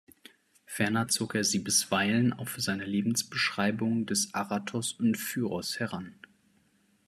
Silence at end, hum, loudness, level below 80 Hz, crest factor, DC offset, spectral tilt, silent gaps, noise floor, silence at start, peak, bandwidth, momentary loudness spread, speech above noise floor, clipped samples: 0.95 s; none; -29 LUFS; -72 dBFS; 18 dB; under 0.1%; -3.5 dB/octave; none; -68 dBFS; 0.7 s; -12 dBFS; 14 kHz; 8 LU; 38 dB; under 0.1%